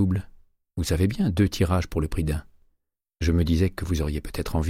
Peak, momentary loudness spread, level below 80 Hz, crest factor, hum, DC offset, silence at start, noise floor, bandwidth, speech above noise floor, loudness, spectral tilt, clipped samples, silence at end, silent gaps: -10 dBFS; 8 LU; -34 dBFS; 16 dB; none; under 0.1%; 0 s; -75 dBFS; 15.5 kHz; 52 dB; -25 LUFS; -6.5 dB/octave; under 0.1%; 0 s; none